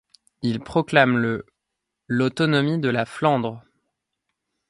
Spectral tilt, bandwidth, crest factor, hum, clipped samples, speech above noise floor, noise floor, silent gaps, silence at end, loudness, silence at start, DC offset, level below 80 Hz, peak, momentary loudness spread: -6.5 dB/octave; 11.5 kHz; 22 dB; none; under 0.1%; 61 dB; -82 dBFS; none; 1.1 s; -22 LUFS; 0.45 s; under 0.1%; -58 dBFS; 0 dBFS; 10 LU